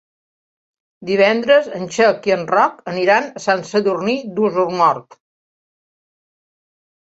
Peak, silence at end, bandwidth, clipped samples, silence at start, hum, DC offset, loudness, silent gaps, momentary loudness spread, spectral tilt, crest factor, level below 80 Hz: -2 dBFS; 2 s; 8 kHz; under 0.1%; 1 s; none; under 0.1%; -17 LUFS; none; 6 LU; -5 dB/octave; 18 dB; -64 dBFS